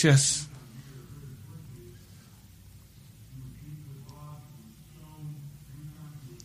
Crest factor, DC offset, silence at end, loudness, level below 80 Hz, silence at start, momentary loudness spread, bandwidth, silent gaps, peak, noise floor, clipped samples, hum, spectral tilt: 22 dB; under 0.1%; 0.1 s; -28 LUFS; -58 dBFS; 0 s; 21 LU; 15.5 kHz; none; -10 dBFS; -52 dBFS; under 0.1%; none; -4 dB/octave